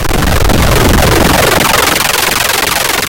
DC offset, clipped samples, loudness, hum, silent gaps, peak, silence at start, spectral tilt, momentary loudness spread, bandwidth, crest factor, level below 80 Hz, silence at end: under 0.1%; under 0.1%; -8 LUFS; none; none; 0 dBFS; 0 s; -3.5 dB/octave; 3 LU; 17.5 kHz; 8 dB; -16 dBFS; 0.05 s